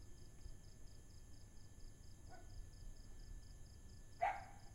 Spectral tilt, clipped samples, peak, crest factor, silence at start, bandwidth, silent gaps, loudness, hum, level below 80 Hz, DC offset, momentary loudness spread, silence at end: -4.5 dB/octave; under 0.1%; -28 dBFS; 24 dB; 0 s; 16 kHz; none; -54 LUFS; none; -58 dBFS; under 0.1%; 19 LU; 0 s